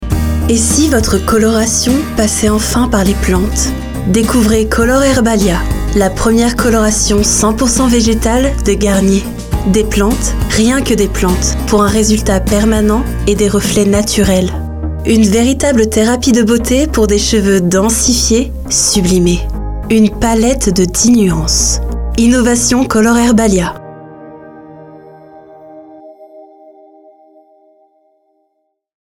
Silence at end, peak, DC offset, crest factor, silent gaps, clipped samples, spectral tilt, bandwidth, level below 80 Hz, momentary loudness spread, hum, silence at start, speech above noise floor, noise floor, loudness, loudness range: 2.75 s; 0 dBFS; under 0.1%; 12 dB; none; under 0.1%; -4.5 dB/octave; 19 kHz; -20 dBFS; 5 LU; none; 0 s; 55 dB; -66 dBFS; -11 LUFS; 2 LU